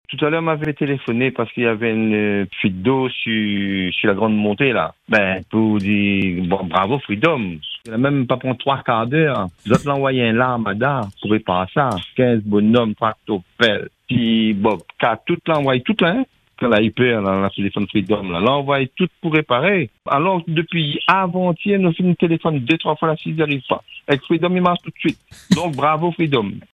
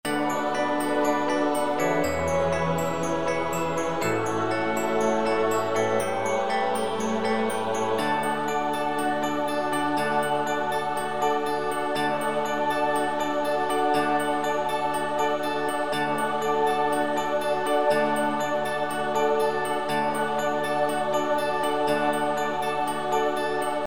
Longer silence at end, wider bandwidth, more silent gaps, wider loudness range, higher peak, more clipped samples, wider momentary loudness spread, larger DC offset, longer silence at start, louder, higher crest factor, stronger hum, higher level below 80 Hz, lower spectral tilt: first, 0.15 s vs 0 s; second, 11.5 kHz vs 19 kHz; neither; about the same, 1 LU vs 1 LU; first, 0 dBFS vs -10 dBFS; neither; about the same, 5 LU vs 3 LU; second, under 0.1% vs 1%; about the same, 0.1 s vs 0.05 s; first, -18 LUFS vs -25 LUFS; about the same, 18 dB vs 14 dB; neither; about the same, -54 dBFS vs -58 dBFS; first, -7 dB/octave vs -4.5 dB/octave